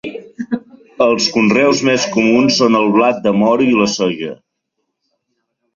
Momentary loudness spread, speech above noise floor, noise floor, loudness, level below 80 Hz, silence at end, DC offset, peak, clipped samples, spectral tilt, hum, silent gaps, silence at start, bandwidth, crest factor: 13 LU; 60 dB; -73 dBFS; -13 LUFS; -56 dBFS; 1.4 s; under 0.1%; 0 dBFS; under 0.1%; -4.5 dB/octave; none; none; 0.05 s; 7.6 kHz; 14 dB